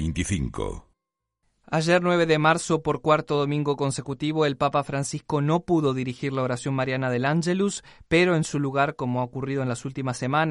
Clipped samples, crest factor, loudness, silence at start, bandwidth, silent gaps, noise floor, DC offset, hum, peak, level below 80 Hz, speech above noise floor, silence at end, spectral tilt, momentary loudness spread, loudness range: under 0.1%; 18 dB; -24 LUFS; 0 s; 11.5 kHz; none; -83 dBFS; under 0.1%; none; -6 dBFS; -46 dBFS; 59 dB; 0 s; -5.5 dB/octave; 8 LU; 2 LU